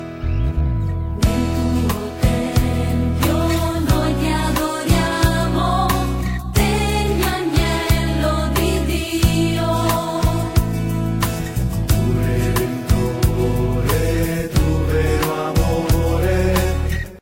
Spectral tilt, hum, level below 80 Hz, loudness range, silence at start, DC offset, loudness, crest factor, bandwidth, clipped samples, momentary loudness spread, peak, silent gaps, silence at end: -6 dB/octave; none; -24 dBFS; 1 LU; 0 s; 0.5%; -19 LUFS; 16 dB; 16.5 kHz; under 0.1%; 4 LU; -2 dBFS; none; 0 s